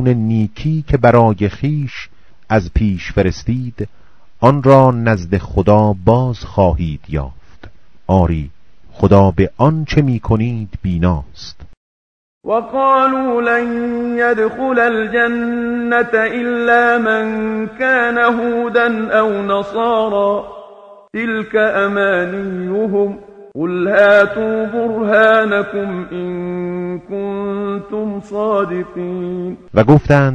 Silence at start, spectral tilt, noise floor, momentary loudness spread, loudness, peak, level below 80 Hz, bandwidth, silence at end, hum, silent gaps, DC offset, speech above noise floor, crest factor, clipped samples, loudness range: 0 s; -8 dB/octave; -41 dBFS; 12 LU; -15 LUFS; 0 dBFS; -34 dBFS; 9 kHz; 0 s; none; 11.77-12.41 s; under 0.1%; 27 dB; 14 dB; 0.2%; 4 LU